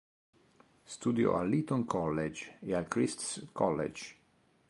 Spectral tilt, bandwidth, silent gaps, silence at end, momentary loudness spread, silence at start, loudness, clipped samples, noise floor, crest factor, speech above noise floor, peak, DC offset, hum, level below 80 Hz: -5.5 dB/octave; 11.5 kHz; none; 0.55 s; 12 LU; 0.9 s; -33 LUFS; under 0.1%; -65 dBFS; 20 dB; 32 dB; -14 dBFS; under 0.1%; none; -62 dBFS